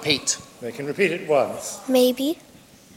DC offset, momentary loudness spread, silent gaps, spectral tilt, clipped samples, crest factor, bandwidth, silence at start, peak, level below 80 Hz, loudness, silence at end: under 0.1%; 12 LU; none; -3 dB/octave; under 0.1%; 20 dB; 16.5 kHz; 0 s; -4 dBFS; -64 dBFS; -22 LUFS; 0.6 s